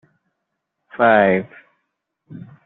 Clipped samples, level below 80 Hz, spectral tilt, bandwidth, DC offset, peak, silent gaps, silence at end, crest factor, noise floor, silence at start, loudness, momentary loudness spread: under 0.1%; -64 dBFS; -4.5 dB/octave; 4.2 kHz; under 0.1%; -2 dBFS; none; 0.25 s; 18 dB; -77 dBFS; 1 s; -16 LUFS; 25 LU